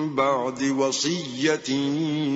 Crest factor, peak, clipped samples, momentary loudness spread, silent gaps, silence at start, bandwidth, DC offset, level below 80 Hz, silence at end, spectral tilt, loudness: 16 dB; -8 dBFS; under 0.1%; 2 LU; none; 0 s; 8 kHz; under 0.1%; -68 dBFS; 0 s; -4 dB/octave; -24 LUFS